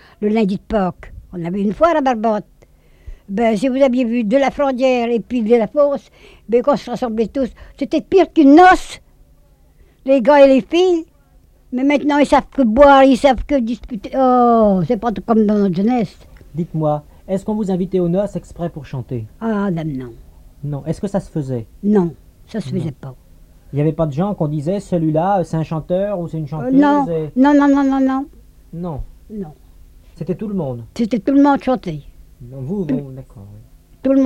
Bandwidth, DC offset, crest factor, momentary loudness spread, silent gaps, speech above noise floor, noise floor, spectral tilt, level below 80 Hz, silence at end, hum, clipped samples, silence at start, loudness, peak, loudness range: 11 kHz; under 0.1%; 16 dB; 16 LU; none; 34 dB; -50 dBFS; -7.5 dB/octave; -40 dBFS; 0 s; none; under 0.1%; 0.2 s; -16 LUFS; 0 dBFS; 9 LU